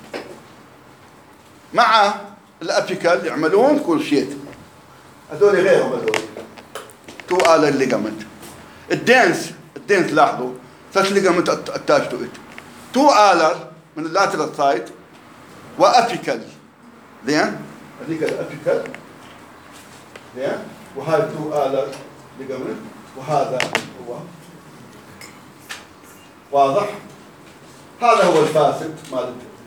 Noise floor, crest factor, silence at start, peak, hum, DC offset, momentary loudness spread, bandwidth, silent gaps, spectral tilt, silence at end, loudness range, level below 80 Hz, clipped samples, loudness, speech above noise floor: -46 dBFS; 20 dB; 0.05 s; 0 dBFS; none; under 0.1%; 23 LU; over 20 kHz; none; -4.5 dB/octave; 0.1 s; 8 LU; -64 dBFS; under 0.1%; -18 LUFS; 28 dB